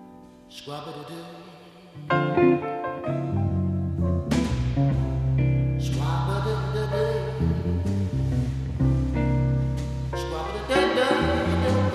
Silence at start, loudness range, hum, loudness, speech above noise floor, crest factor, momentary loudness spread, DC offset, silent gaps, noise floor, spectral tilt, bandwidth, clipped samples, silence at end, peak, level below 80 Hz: 0 s; 2 LU; none; -25 LUFS; 22 dB; 18 dB; 14 LU; under 0.1%; none; -47 dBFS; -7 dB/octave; 12 kHz; under 0.1%; 0 s; -8 dBFS; -34 dBFS